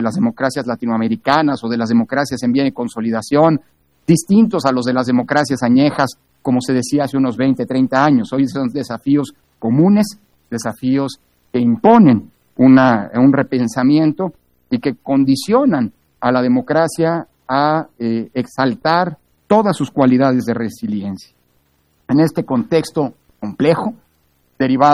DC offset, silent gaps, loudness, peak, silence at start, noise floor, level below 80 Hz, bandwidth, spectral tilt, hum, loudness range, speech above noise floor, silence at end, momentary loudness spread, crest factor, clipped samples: under 0.1%; none; -16 LUFS; 0 dBFS; 0 s; -60 dBFS; -56 dBFS; 12.5 kHz; -6.5 dB/octave; none; 5 LU; 45 dB; 0 s; 10 LU; 16 dB; under 0.1%